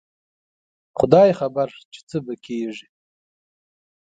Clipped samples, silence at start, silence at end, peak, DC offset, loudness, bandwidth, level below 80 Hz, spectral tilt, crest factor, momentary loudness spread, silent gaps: under 0.1%; 0.95 s; 1.25 s; 0 dBFS; under 0.1%; -20 LUFS; 9 kHz; -56 dBFS; -7.5 dB/octave; 22 dB; 17 LU; 1.85-1.91 s, 2.03-2.07 s